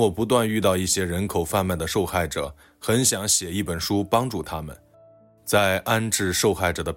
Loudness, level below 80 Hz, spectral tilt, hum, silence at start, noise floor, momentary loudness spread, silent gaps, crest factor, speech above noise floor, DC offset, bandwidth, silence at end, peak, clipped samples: -23 LUFS; -48 dBFS; -3.5 dB/octave; none; 0 s; -53 dBFS; 10 LU; none; 16 dB; 30 dB; under 0.1%; 16.5 kHz; 0 s; -6 dBFS; under 0.1%